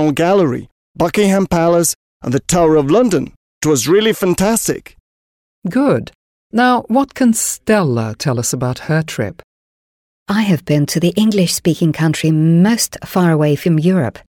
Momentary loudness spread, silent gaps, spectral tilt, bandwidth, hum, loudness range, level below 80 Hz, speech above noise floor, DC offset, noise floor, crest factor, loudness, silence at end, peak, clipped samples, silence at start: 8 LU; 0.72-0.95 s, 1.95-2.20 s, 3.36-3.61 s, 5.00-5.62 s, 6.15-6.50 s, 9.44-10.26 s; -5.5 dB/octave; 18 kHz; none; 4 LU; -44 dBFS; over 76 dB; under 0.1%; under -90 dBFS; 12 dB; -15 LUFS; 0.25 s; -2 dBFS; under 0.1%; 0 s